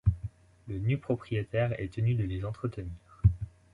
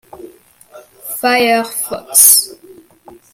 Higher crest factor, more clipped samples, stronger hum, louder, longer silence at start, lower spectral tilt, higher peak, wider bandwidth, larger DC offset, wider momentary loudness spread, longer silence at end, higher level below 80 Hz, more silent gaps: about the same, 20 dB vs 16 dB; second, under 0.1% vs 0.3%; neither; second, -32 LUFS vs -10 LUFS; about the same, 0.05 s vs 0.15 s; first, -9.5 dB/octave vs 0 dB/octave; second, -10 dBFS vs 0 dBFS; second, 4.8 kHz vs over 20 kHz; neither; second, 13 LU vs 20 LU; second, 0.25 s vs 0.8 s; first, -40 dBFS vs -60 dBFS; neither